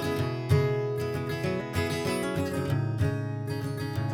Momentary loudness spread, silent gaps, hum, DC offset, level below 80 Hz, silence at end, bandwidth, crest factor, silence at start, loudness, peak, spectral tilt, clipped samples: 7 LU; none; none; under 0.1%; -56 dBFS; 0 s; 18.5 kHz; 16 dB; 0 s; -29 LUFS; -12 dBFS; -6.5 dB/octave; under 0.1%